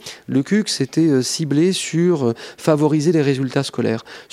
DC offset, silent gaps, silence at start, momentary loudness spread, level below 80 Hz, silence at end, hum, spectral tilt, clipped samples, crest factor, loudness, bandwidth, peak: under 0.1%; none; 0.05 s; 6 LU; -64 dBFS; 0.1 s; none; -5.5 dB/octave; under 0.1%; 18 dB; -18 LUFS; 15.5 kHz; 0 dBFS